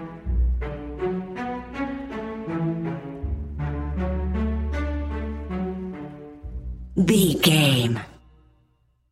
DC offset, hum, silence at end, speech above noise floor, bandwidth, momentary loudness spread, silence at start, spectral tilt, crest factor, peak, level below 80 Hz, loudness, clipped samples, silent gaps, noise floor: under 0.1%; none; 0.95 s; 45 dB; 16 kHz; 17 LU; 0 s; -5 dB/octave; 22 dB; -4 dBFS; -32 dBFS; -25 LUFS; under 0.1%; none; -64 dBFS